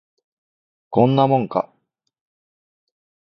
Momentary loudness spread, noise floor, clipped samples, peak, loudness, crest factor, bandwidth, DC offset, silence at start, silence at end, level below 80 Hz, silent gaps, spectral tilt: 10 LU; under -90 dBFS; under 0.1%; -2 dBFS; -18 LUFS; 20 dB; 6 kHz; under 0.1%; 0.9 s; 1.6 s; -64 dBFS; none; -10 dB/octave